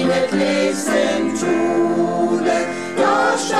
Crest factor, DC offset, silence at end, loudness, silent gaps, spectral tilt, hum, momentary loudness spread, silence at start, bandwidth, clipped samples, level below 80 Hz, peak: 12 dB; 0.6%; 0 s; -18 LUFS; none; -4.5 dB/octave; none; 3 LU; 0 s; 13.5 kHz; under 0.1%; -60 dBFS; -4 dBFS